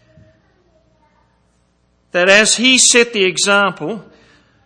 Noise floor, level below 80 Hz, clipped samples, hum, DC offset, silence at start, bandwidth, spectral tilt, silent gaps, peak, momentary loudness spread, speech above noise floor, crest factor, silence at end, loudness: -59 dBFS; -58 dBFS; under 0.1%; none; under 0.1%; 2.15 s; 11 kHz; -1 dB/octave; none; 0 dBFS; 17 LU; 46 dB; 16 dB; 0.65 s; -11 LUFS